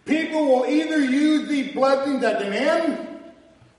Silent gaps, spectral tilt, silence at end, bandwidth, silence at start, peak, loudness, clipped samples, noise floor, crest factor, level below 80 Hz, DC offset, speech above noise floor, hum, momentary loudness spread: none; -4.5 dB/octave; 0.5 s; 11.5 kHz; 0.05 s; -8 dBFS; -21 LUFS; under 0.1%; -50 dBFS; 14 dB; -68 dBFS; under 0.1%; 30 dB; none; 7 LU